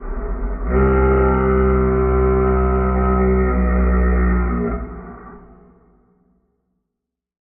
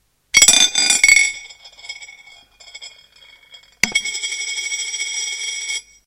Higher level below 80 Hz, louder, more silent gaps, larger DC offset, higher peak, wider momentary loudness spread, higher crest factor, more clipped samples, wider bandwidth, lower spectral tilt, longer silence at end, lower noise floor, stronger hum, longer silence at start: first, -22 dBFS vs -48 dBFS; second, -17 LUFS vs -14 LUFS; neither; neither; second, -6 dBFS vs 0 dBFS; second, 13 LU vs 24 LU; second, 12 dB vs 20 dB; neither; second, 3 kHz vs 17 kHz; first, -10 dB/octave vs 2.5 dB/octave; first, 2.05 s vs 0.25 s; first, -81 dBFS vs -48 dBFS; neither; second, 0 s vs 0.35 s